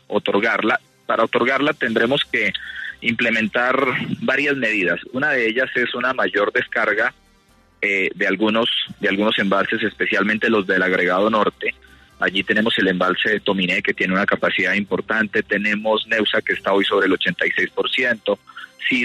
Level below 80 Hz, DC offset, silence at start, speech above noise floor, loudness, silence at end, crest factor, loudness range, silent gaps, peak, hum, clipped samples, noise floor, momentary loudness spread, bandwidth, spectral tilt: -58 dBFS; under 0.1%; 0.1 s; 36 dB; -19 LUFS; 0 s; 16 dB; 1 LU; none; -4 dBFS; none; under 0.1%; -55 dBFS; 4 LU; 13 kHz; -5 dB/octave